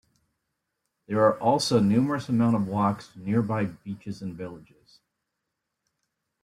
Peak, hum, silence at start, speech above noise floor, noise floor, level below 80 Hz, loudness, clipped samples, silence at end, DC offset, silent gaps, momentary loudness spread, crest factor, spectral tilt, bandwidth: -10 dBFS; none; 1.1 s; 57 dB; -82 dBFS; -62 dBFS; -25 LUFS; under 0.1%; 1.85 s; under 0.1%; none; 15 LU; 18 dB; -6.5 dB/octave; 14 kHz